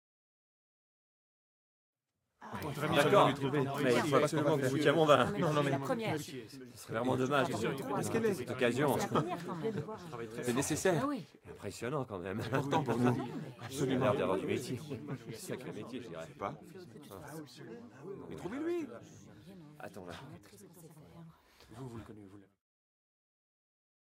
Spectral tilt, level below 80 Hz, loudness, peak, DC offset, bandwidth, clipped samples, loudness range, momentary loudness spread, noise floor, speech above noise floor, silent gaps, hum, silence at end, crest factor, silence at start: -5.5 dB/octave; -72 dBFS; -34 LUFS; -12 dBFS; under 0.1%; 16 kHz; under 0.1%; 21 LU; 21 LU; -67 dBFS; 32 dB; none; none; 1.6 s; 24 dB; 2.4 s